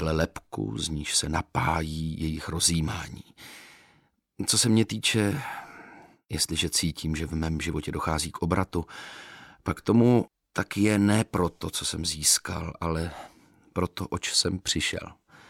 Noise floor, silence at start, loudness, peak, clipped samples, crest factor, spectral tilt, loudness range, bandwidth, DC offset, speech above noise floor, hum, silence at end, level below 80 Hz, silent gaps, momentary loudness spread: -65 dBFS; 0 s; -27 LUFS; -8 dBFS; under 0.1%; 20 dB; -4 dB/octave; 4 LU; 16.5 kHz; under 0.1%; 38 dB; none; 0.35 s; -44 dBFS; none; 18 LU